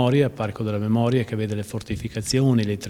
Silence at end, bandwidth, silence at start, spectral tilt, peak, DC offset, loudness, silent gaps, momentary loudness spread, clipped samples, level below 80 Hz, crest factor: 0 s; 14.5 kHz; 0 s; -6.5 dB/octave; -6 dBFS; under 0.1%; -23 LUFS; none; 10 LU; under 0.1%; -48 dBFS; 16 dB